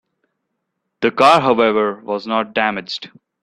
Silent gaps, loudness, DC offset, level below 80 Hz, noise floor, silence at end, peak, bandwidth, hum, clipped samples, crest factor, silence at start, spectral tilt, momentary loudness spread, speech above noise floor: none; -16 LUFS; under 0.1%; -60 dBFS; -74 dBFS; 0.35 s; 0 dBFS; 13 kHz; none; under 0.1%; 18 dB; 1 s; -5 dB/octave; 14 LU; 58 dB